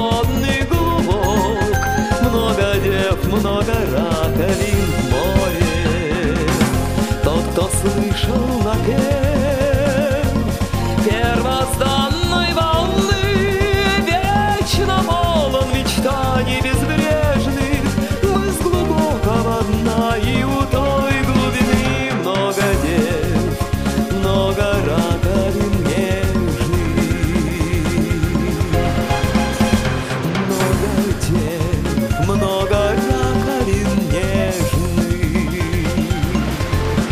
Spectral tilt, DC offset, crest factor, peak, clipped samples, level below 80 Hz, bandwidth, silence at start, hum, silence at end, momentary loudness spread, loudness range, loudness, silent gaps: -5.5 dB/octave; 0.8%; 16 dB; 0 dBFS; under 0.1%; -26 dBFS; 15.5 kHz; 0 s; none; 0 s; 3 LU; 2 LU; -17 LUFS; none